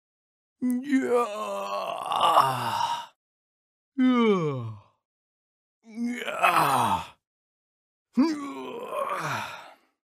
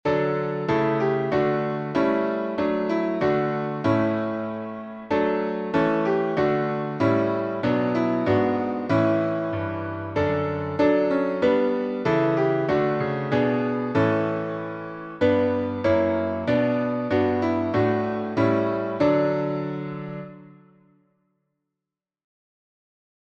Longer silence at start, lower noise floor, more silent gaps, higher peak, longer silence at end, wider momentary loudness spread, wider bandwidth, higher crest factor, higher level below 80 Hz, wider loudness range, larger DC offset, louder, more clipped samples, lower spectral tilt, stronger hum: first, 0.6 s vs 0.05 s; second, -47 dBFS vs -88 dBFS; first, 3.16-3.92 s, 5.05-5.81 s, 7.27-8.05 s vs none; about the same, -6 dBFS vs -8 dBFS; second, 0.5 s vs 2.8 s; first, 15 LU vs 7 LU; first, 15.5 kHz vs 7.6 kHz; first, 22 dB vs 16 dB; second, -70 dBFS vs -56 dBFS; about the same, 3 LU vs 3 LU; neither; second, -26 LUFS vs -23 LUFS; neither; second, -5 dB/octave vs -8.5 dB/octave; neither